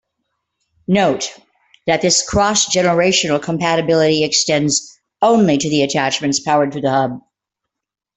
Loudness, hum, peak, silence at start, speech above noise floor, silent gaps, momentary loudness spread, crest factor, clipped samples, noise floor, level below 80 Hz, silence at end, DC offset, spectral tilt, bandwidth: -15 LUFS; none; 0 dBFS; 0.9 s; 68 dB; none; 6 LU; 16 dB; under 0.1%; -83 dBFS; -48 dBFS; 1 s; under 0.1%; -3.5 dB/octave; 8.4 kHz